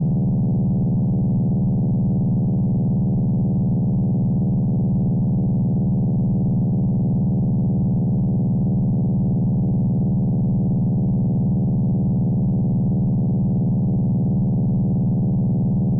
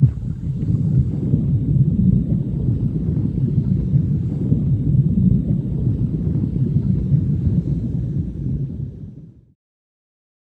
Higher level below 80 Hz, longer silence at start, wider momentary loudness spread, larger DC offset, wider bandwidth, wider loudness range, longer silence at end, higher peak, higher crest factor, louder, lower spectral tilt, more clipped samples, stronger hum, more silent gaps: second, -36 dBFS vs -30 dBFS; about the same, 0 s vs 0 s; second, 0 LU vs 8 LU; neither; second, 1.2 kHz vs 1.7 kHz; second, 0 LU vs 3 LU; second, 0 s vs 1.15 s; second, -14 dBFS vs -2 dBFS; second, 6 dB vs 16 dB; about the same, -20 LUFS vs -20 LUFS; about the same, -12.5 dB/octave vs -12.5 dB/octave; neither; neither; neither